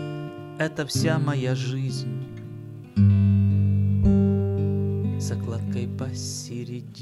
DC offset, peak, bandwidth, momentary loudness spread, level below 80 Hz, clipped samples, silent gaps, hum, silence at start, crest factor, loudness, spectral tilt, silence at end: under 0.1%; -8 dBFS; 12.5 kHz; 15 LU; -42 dBFS; under 0.1%; none; none; 0 s; 16 dB; -24 LUFS; -6.5 dB/octave; 0 s